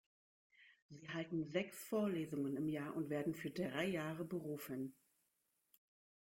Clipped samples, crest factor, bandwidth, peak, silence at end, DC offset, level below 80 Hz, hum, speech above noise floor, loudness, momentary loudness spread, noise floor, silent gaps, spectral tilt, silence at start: under 0.1%; 18 dB; 16.5 kHz; -26 dBFS; 1.45 s; under 0.1%; -80 dBFS; none; 42 dB; -43 LUFS; 7 LU; -84 dBFS; 0.82-0.89 s; -6 dB/octave; 0.6 s